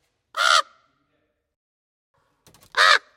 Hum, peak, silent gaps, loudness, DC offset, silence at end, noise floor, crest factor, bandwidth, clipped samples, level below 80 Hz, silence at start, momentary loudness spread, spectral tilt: none; -2 dBFS; 1.56-2.14 s; -18 LUFS; under 0.1%; 0.2 s; -72 dBFS; 22 dB; 16.5 kHz; under 0.1%; -76 dBFS; 0.35 s; 13 LU; 3 dB/octave